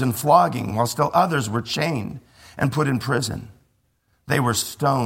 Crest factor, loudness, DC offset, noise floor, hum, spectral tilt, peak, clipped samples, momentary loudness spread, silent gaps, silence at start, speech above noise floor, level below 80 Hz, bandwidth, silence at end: 20 dB; -21 LUFS; under 0.1%; -66 dBFS; none; -5 dB/octave; -2 dBFS; under 0.1%; 12 LU; none; 0 s; 45 dB; -52 dBFS; 16.5 kHz; 0 s